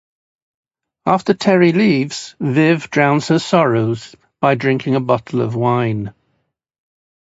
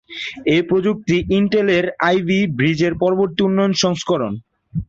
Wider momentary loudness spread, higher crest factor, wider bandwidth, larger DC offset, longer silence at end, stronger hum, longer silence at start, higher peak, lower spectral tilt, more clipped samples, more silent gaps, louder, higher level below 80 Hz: first, 10 LU vs 6 LU; about the same, 16 dB vs 16 dB; about the same, 8 kHz vs 7.8 kHz; neither; first, 1.1 s vs 0.05 s; neither; first, 1.05 s vs 0.1 s; about the same, 0 dBFS vs -2 dBFS; about the same, -6.5 dB/octave vs -5.5 dB/octave; neither; neither; about the same, -16 LUFS vs -17 LUFS; second, -56 dBFS vs -44 dBFS